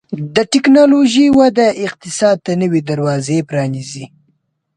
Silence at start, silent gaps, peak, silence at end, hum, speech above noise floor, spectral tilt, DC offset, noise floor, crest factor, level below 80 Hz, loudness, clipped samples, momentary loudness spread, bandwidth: 0.1 s; none; 0 dBFS; 0.7 s; none; 50 dB; -5.5 dB/octave; under 0.1%; -63 dBFS; 12 dB; -52 dBFS; -13 LUFS; under 0.1%; 13 LU; 10 kHz